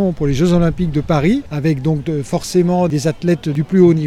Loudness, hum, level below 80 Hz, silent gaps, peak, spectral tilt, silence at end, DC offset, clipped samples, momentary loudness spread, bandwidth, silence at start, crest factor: -16 LUFS; none; -32 dBFS; none; 0 dBFS; -7.5 dB/octave; 0 s; under 0.1%; under 0.1%; 6 LU; 13.5 kHz; 0 s; 14 dB